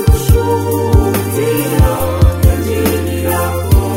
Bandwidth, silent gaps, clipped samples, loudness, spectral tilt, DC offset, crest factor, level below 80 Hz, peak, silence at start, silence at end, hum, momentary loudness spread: 16.5 kHz; none; under 0.1%; -13 LUFS; -6.5 dB/octave; under 0.1%; 12 dB; -18 dBFS; 0 dBFS; 0 s; 0 s; none; 4 LU